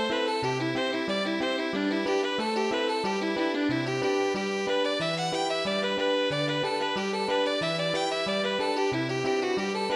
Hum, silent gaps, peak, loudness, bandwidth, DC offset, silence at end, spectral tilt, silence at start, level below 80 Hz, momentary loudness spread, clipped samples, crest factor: none; none; -16 dBFS; -27 LUFS; 15 kHz; under 0.1%; 0 s; -4.5 dB/octave; 0 s; -66 dBFS; 2 LU; under 0.1%; 12 dB